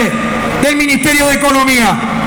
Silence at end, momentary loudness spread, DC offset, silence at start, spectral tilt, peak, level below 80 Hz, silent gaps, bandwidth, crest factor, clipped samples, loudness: 0 s; 5 LU; under 0.1%; 0 s; -3.5 dB/octave; 0 dBFS; -32 dBFS; none; 19.5 kHz; 12 dB; under 0.1%; -10 LUFS